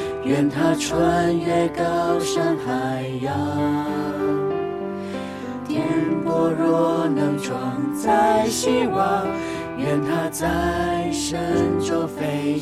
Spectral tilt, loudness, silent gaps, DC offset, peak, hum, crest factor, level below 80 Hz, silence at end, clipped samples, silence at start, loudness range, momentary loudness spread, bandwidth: -5.5 dB/octave; -22 LUFS; none; under 0.1%; -6 dBFS; none; 14 dB; -46 dBFS; 0 s; under 0.1%; 0 s; 4 LU; 7 LU; 15.5 kHz